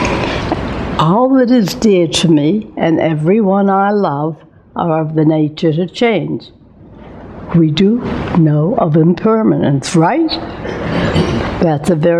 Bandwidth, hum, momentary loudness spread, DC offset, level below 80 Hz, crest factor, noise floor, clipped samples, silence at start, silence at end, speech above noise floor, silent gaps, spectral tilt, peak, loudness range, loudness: 13.5 kHz; none; 9 LU; under 0.1%; -36 dBFS; 12 dB; -37 dBFS; under 0.1%; 0 s; 0 s; 25 dB; none; -6.5 dB/octave; 0 dBFS; 4 LU; -13 LUFS